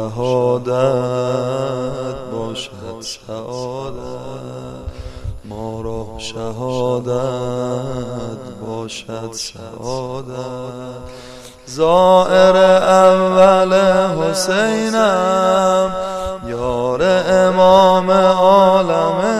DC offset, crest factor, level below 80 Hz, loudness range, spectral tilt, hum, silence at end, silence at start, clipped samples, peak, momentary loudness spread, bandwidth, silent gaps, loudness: under 0.1%; 16 dB; -40 dBFS; 16 LU; -5 dB/octave; none; 0 s; 0 s; under 0.1%; 0 dBFS; 19 LU; 13.5 kHz; none; -15 LUFS